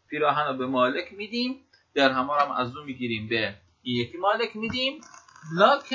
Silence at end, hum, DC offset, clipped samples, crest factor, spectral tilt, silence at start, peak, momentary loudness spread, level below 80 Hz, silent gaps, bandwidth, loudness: 0 s; none; under 0.1%; under 0.1%; 22 dB; -5.5 dB/octave; 0.1 s; -6 dBFS; 10 LU; -62 dBFS; none; 7.6 kHz; -26 LUFS